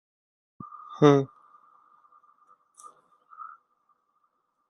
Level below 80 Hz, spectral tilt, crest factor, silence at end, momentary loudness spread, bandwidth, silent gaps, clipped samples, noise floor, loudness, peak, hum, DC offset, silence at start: -72 dBFS; -7.5 dB/octave; 26 dB; 1.25 s; 26 LU; 11 kHz; none; under 0.1%; -74 dBFS; -22 LUFS; -4 dBFS; none; under 0.1%; 0.9 s